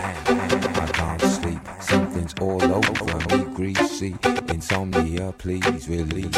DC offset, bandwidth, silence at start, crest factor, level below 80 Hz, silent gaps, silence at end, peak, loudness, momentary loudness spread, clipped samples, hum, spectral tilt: under 0.1%; 16 kHz; 0 s; 16 dB; -40 dBFS; none; 0 s; -8 dBFS; -23 LUFS; 6 LU; under 0.1%; none; -5 dB/octave